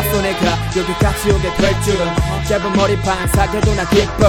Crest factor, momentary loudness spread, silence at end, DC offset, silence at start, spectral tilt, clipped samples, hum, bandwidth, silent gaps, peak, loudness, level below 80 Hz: 14 dB; 3 LU; 0 s; under 0.1%; 0 s; -5 dB/octave; under 0.1%; none; over 20 kHz; none; 0 dBFS; -16 LUFS; -24 dBFS